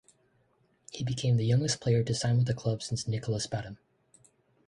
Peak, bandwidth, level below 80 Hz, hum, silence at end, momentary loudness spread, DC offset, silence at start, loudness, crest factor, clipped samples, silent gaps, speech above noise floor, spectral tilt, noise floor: -14 dBFS; 11 kHz; -58 dBFS; none; 0.95 s; 11 LU; under 0.1%; 0.95 s; -30 LUFS; 16 dB; under 0.1%; none; 41 dB; -5.5 dB/octave; -70 dBFS